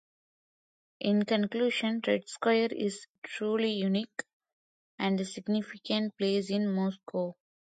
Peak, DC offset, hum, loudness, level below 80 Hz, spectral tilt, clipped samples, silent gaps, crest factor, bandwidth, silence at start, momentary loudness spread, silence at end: -14 dBFS; under 0.1%; none; -31 LUFS; -78 dBFS; -5.5 dB/octave; under 0.1%; 3.10-3.22 s, 4.33-4.40 s, 4.53-4.98 s; 18 dB; 9.2 kHz; 1 s; 8 LU; 0.3 s